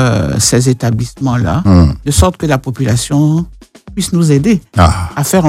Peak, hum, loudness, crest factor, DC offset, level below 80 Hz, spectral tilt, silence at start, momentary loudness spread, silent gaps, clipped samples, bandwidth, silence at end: 0 dBFS; none; -12 LUFS; 10 dB; under 0.1%; -24 dBFS; -5.5 dB/octave; 0 s; 6 LU; none; 0.3%; 16 kHz; 0 s